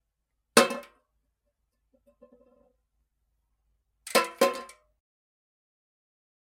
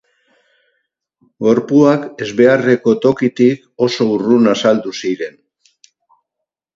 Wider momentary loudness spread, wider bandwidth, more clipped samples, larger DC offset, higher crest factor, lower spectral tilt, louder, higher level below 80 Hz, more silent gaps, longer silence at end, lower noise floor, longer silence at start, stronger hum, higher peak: first, 18 LU vs 10 LU; first, 16 kHz vs 7.6 kHz; neither; neither; first, 28 dB vs 16 dB; second, -2 dB/octave vs -6 dB/octave; second, -25 LUFS vs -14 LUFS; second, -76 dBFS vs -60 dBFS; neither; first, 1.85 s vs 1.45 s; about the same, -81 dBFS vs -80 dBFS; second, 0.55 s vs 1.4 s; neither; second, -4 dBFS vs 0 dBFS